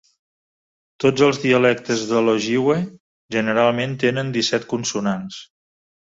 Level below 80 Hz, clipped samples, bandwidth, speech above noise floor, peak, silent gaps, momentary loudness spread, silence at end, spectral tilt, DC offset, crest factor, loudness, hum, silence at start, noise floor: -60 dBFS; under 0.1%; 7.8 kHz; over 71 dB; -2 dBFS; 3.00-3.29 s; 9 LU; 0.6 s; -5 dB/octave; under 0.1%; 18 dB; -19 LUFS; none; 1 s; under -90 dBFS